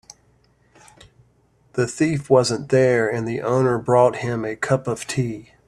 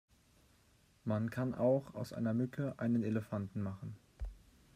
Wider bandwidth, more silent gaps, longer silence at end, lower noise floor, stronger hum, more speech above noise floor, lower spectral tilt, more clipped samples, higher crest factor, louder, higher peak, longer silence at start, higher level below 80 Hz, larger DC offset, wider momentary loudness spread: second, 12.5 kHz vs 14.5 kHz; neither; about the same, 0.25 s vs 0.35 s; second, -59 dBFS vs -69 dBFS; neither; first, 40 dB vs 33 dB; second, -6 dB/octave vs -8.5 dB/octave; neither; about the same, 18 dB vs 18 dB; first, -20 LUFS vs -37 LUFS; first, -2 dBFS vs -20 dBFS; first, 1.75 s vs 1.05 s; about the same, -56 dBFS vs -56 dBFS; neither; second, 8 LU vs 17 LU